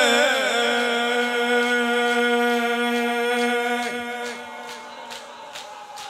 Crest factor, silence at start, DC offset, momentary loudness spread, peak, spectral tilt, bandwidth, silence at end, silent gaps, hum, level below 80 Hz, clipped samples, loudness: 16 dB; 0 s; under 0.1%; 17 LU; -6 dBFS; -1.5 dB/octave; 16 kHz; 0 s; none; none; -74 dBFS; under 0.1%; -21 LUFS